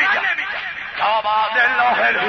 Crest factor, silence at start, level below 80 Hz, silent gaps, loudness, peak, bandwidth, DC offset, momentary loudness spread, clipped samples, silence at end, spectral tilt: 12 dB; 0 s; -58 dBFS; none; -17 LUFS; -6 dBFS; 6.4 kHz; under 0.1%; 9 LU; under 0.1%; 0 s; -3 dB/octave